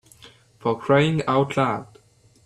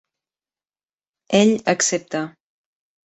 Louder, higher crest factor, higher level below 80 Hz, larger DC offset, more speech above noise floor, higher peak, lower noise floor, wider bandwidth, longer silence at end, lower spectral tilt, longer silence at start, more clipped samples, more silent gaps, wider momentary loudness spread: second, -22 LUFS vs -19 LUFS; about the same, 18 dB vs 20 dB; first, -58 dBFS vs -64 dBFS; neither; second, 34 dB vs over 72 dB; second, -6 dBFS vs -2 dBFS; second, -55 dBFS vs under -90 dBFS; first, 12 kHz vs 8.2 kHz; second, 0.6 s vs 0.75 s; first, -7 dB/octave vs -3.5 dB/octave; second, 0.25 s vs 1.3 s; neither; neither; about the same, 9 LU vs 11 LU